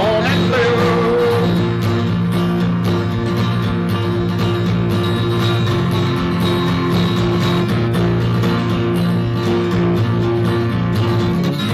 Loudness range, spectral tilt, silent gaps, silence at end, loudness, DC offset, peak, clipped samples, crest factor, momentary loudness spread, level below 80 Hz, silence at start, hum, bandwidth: 1 LU; -7 dB/octave; none; 0 s; -16 LUFS; under 0.1%; -4 dBFS; under 0.1%; 12 dB; 3 LU; -38 dBFS; 0 s; none; 14 kHz